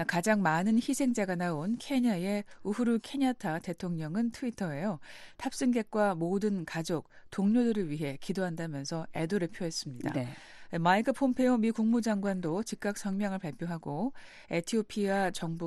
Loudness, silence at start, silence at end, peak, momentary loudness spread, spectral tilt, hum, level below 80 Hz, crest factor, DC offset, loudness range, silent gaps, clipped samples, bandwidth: -32 LUFS; 0 s; 0 s; -14 dBFS; 10 LU; -5.5 dB/octave; none; -62 dBFS; 18 dB; under 0.1%; 4 LU; none; under 0.1%; 12.5 kHz